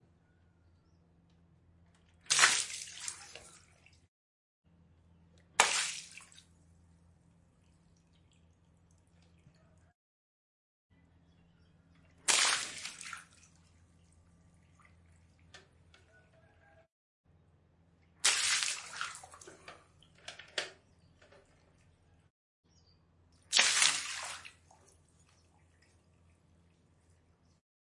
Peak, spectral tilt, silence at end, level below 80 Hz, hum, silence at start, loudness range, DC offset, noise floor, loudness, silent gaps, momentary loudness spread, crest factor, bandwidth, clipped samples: -6 dBFS; 1.5 dB/octave; 3.5 s; -78 dBFS; none; 2.3 s; 15 LU; under 0.1%; -69 dBFS; -31 LUFS; 4.08-4.64 s, 9.95-10.90 s, 16.92-17.24 s, 22.30-22.63 s; 27 LU; 34 dB; 11.5 kHz; under 0.1%